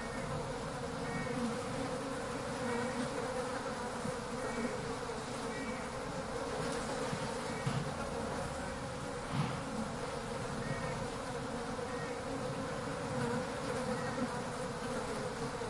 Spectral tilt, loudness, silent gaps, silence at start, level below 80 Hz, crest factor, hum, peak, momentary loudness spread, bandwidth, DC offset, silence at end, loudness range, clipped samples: -5 dB/octave; -39 LUFS; none; 0 s; -56 dBFS; 16 dB; none; -22 dBFS; 3 LU; 11.5 kHz; under 0.1%; 0 s; 1 LU; under 0.1%